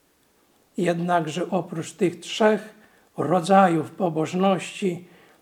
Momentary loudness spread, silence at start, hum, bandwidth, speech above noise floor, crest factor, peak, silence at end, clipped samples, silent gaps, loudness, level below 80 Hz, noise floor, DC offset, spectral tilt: 12 LU; 0.75 s; none; 14.5 kHz; 40 dB; 20 dB; -4 dBFS; 0.35 s; under 0.1%; none; -23 LUFS; -76 dBFS; -63 dBFS; under 0.1%; -6 dB/octave